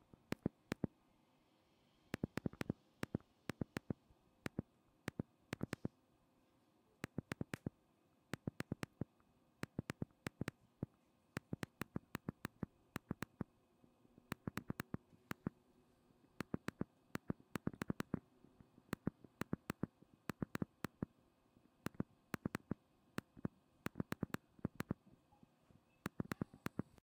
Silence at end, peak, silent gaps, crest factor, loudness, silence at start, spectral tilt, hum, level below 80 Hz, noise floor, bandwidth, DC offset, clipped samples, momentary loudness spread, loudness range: 0.25 s; -22 dBFS; none; 28 dB; -49 LUFS; 0.45 s; -6.5 dB/octave; none; -70 dBFS; -76 dBFS; 16 kHz; under 0.1%; under 0.1%; 7 LU; 3 LU